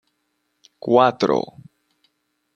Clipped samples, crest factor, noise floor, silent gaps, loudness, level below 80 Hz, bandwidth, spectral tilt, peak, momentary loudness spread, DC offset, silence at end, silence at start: under 0.1%; 20 dB; -72 dBFS; none; -18 LUFS; -68 dBFS; 7.2 kHz; -6.5 dB/octave; -2 dBFS; 17 LU; under 0.1%; 1.15 s; 0.85 s